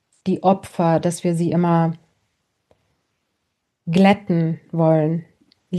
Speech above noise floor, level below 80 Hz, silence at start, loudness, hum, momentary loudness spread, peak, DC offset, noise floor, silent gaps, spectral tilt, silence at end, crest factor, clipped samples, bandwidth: 57 dB; -62 dBFS; 0.25 s; -19 LUFS; none; 9 LU; -2 dBFS; under 0.1%; -75 dBFS; none; -7.5 dB/octave; 0 s; 18 dB; under 0.1%; 12 kHz